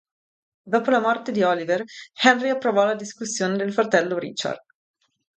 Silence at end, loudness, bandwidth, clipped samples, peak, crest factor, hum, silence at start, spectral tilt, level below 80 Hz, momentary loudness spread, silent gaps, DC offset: 0.8 s; -22 LUFS; 9.2 kHz; under 0.1%; -2 dBFS; 20 dB; none; 0.65 s; -4 dB/octave; -74 dBFS; 10 LU; none; under 0.1%